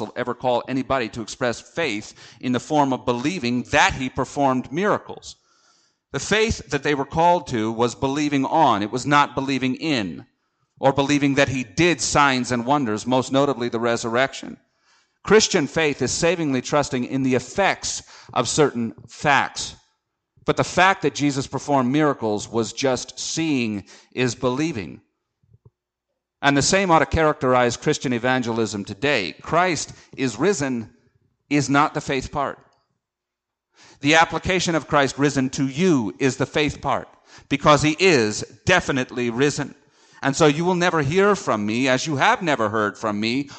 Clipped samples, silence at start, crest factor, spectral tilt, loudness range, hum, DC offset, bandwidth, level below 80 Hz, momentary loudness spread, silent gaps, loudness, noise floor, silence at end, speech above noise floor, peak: under 0.1%; 0 s; 20 dB; -4.5 dB/octave; 4 LU; none; under 0.1%; 9.2 kHz; -48 dBFS; 10 LU; none; -21 LUFS; -84 dBFS; 0 s; 63 dB; -2 dBFS